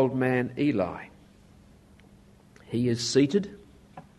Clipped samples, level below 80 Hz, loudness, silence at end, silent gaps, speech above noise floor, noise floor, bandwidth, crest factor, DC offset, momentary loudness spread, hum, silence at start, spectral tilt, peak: under 0.1%; -60 dBFS; -26 LUFS; 0.15 s; none; 29 dB; -55 dBFS; 12 kHz; 20 dB; under 0.1%; 16 LU; none; 0 s; -5.5 dB/octave; -10 dBFS